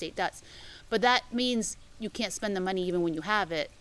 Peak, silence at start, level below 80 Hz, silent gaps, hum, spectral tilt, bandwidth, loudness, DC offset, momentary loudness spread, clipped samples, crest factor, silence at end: -8 dBFS; 0 s; -56 dBFS; none; none; -3.5 dB/octave; 12 kHz; -30 LUFS; under 0.1%; 14 LU; under 0.1%; 22 dB; 0.1 s